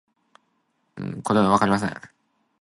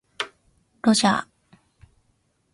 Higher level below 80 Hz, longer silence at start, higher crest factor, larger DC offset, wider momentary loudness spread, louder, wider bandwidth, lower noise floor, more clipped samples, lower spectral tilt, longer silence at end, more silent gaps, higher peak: first, -56 dBFS vs -62 dBFS; first, 0.95 s vs 0.2 s; about the same, 22 dB vs 22 dB; neither; first, 17 LU vs 14 LU; about the same, -22 LUFS vs -22 LUFS; about the same, 11.5 kHz vs 11.5 kHz; about the same, -70 dBFS vs -68 dBFS; neither; first, -6 dB/octave vs -3.5 dB/octave; second, 0.55 s vs 1.3 s; neither; about the same, -4 dBFS vs -6 dBFS